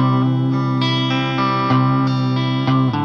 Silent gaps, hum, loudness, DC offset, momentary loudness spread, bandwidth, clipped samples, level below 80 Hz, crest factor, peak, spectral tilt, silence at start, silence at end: none; none; -17 LUFS; under 0.1%; 3 LU; 6.6 kHz; under 0.1%; -52 dBFS; 12 dB; -4 dBFS; -7.5 dB/octave; 0 s; 0 s